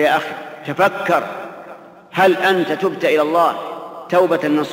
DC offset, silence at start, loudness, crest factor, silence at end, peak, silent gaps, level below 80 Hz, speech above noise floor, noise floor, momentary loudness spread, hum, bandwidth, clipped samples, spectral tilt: under 0.1%; 0 s; -17 LUFS; 14 dB; 0 s; -2 dBFS; none; -68 dBFS; 22 dB; -39 dBFS; 16 LU; none; 16 kHz; under 0.1%; -5.5 dB/octave